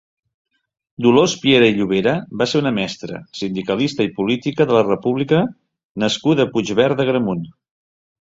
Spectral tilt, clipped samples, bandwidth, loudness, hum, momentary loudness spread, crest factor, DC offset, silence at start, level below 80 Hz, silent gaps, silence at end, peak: -5.5 dB/octave; under 0.1%; 7.8 kHz; -18 LUFS; none; 11 LU; 18 dB; under 0.1%; 1 s; -56 dBFS; 5.85-5.95 s; 0.8 s; -2 dBFS